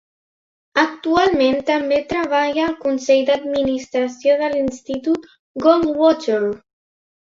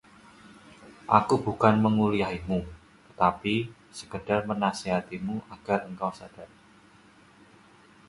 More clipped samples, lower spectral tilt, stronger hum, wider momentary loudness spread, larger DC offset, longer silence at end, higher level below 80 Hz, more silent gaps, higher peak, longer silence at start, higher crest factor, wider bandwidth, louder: neither; second, -4.5 dB/octave vs -6.5 dB/octave; neither; second, 7 LU vs 19 LU; neither; second, 0.7 s vs 1.6 s; about the same, -52 dBFS vs -54 dBFS; first, 5.39-5.55 s vs none; about the same, -2 dBFS vs -4 dBFS; first, 0.75 s vs 0.45 s; second, 16 dB vs 24 dB; second, 7.6 kHz vs 11.5 kHz; first, -18 LUFS vs -27 LUFS